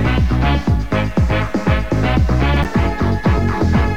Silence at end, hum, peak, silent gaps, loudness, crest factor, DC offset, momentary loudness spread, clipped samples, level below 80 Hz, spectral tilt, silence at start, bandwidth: 0 s; none; -2 dBFS; none; -17 LUFS; 14 dB; 3%; 2 LU; under 0.1%; -20 dBFS; -7.5 dB/octave; 0 s; 9 kHz